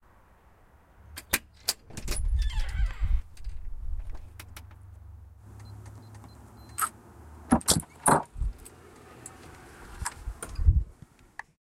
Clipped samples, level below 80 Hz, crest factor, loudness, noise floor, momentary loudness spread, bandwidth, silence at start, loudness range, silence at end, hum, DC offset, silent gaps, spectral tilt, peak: under 0.1%; -34 dBFS; 26 dB; -30 LUFS; -58 dBFS; 25 LU; 16 kHz; 1.1 s; 11 LU; 0.7 s; none; under 0.1%; none; -4 dB/octave; -6 dBFS